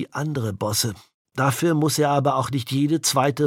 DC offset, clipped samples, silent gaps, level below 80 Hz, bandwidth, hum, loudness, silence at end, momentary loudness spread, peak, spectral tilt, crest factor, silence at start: under 0.1%; under 0.1%; 1.14-1.25 s; -60 dBFS; 17 kHz; none; -22 LUFS; 0 s; 7 LU; -6 dBFS; -4.5 dB/octave; 16 dB; 0 s